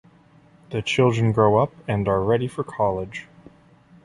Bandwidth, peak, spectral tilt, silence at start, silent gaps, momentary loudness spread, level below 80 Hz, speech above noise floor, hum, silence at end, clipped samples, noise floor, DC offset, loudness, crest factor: 11 kHz; -4 dBFS; -7 dB/octave; 0.7 s; none; 12 LU; -50 dBFS; 32 dB; none; 0.8 s; under 0.1%; -53 dBFS; under 0.1%; -22 LUFS; 18 dB